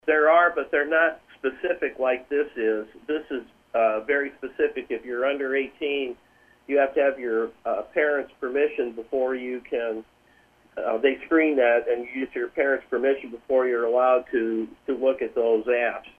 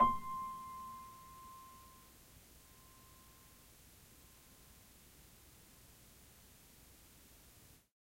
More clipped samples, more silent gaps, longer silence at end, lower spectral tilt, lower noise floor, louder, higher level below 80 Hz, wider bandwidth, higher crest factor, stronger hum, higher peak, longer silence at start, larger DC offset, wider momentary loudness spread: neither; neither; second, 0.1 s vs 0.35 s; first, -6 dB/octave vs -4 dB/octave; second, -59 dBFS vs -63 dBFS; first, -24 LUFS vs -45 LUFS; about the same, -64 dBFS vs -64 dBFS; second, 4.6 kHz vs 16.5 kHz; second, 18 dB vs 28 dB; neither; first, -6 dBFS vs -18 dBFS; about the same, 0.05 s vs 0 s; neither; second, 10 LU vs 15 LU